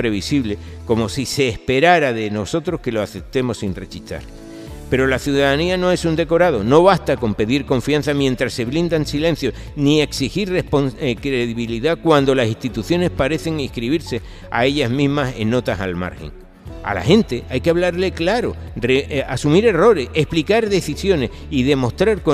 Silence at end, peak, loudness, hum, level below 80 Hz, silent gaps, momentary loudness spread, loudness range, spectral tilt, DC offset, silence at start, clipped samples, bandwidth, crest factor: 0 s; 0 dBFS; -18 LUFS; none; -36 dBFS; none; 10 LU; 4 LU; -6 dB/octave; under 0.1%; 0 s; under 0.1%; 15.5 kHz; 18 dB